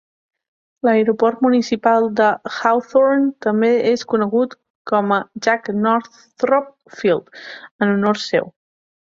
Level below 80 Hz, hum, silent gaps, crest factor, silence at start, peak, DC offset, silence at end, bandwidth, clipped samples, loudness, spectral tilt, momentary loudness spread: -64 dBFS; none; 4.70-4.85 s, 7.71-7.79 s; 16 dB; 0.85 s; -2 dBFS; under 0.1%; 0.65 s; 7.6 kHz; under 0.1%; -18 LUFS; -6 dB/octave; 8 LU